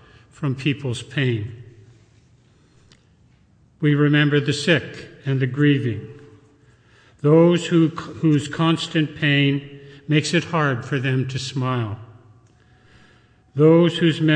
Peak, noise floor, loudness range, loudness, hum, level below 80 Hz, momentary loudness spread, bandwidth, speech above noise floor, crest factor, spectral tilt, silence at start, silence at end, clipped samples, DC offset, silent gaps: -4 dBFS; -56 dBFS; 7 LU; -20 LUFS; none; -60 dBFS; 14 LU; 9.6 kHz; 37 dB; 16 dB; -6.5 dB/octave; 0.4 s; 0 s; under 0.1%; under 0.1%; none